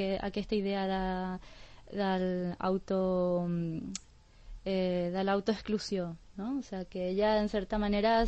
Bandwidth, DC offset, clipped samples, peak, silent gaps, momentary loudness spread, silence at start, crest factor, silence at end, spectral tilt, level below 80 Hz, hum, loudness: 8.4 kHz; under 0.1%; under 0.1%; -16 dBFS; none; 11 LU; 0 s; 16 dB; 0 s; -6.5 dB/octave; -50 dBFS; none; -33 LUFS